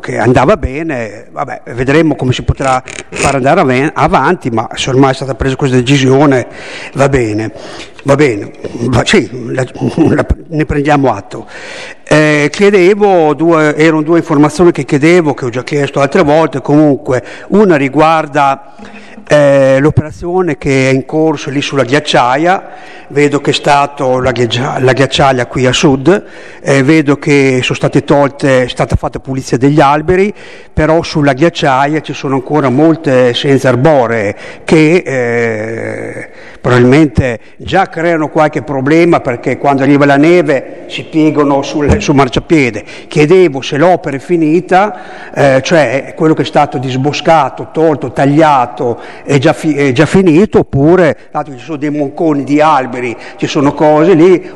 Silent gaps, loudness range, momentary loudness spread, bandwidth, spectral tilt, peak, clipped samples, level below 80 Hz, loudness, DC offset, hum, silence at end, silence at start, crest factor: none; 3 LU; 11 LU; 11.5 kHz; -6 dB/octave; 0 dBFS; 0.1%; -32 dBFS; -10 LUFS; 1%; none; 0 s; 0.05 s; 10 dB